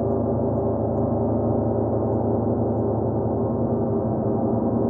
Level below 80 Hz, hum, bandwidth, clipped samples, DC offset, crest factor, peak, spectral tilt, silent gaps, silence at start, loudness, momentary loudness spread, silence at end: -42 dBFS; none; 2 kHz; under 0.1%; under 0.1%; 12 dB; -12 dBFS; -15.5 dB/octave; none; 0 s; -23 LUFS; 1 LU; 0 s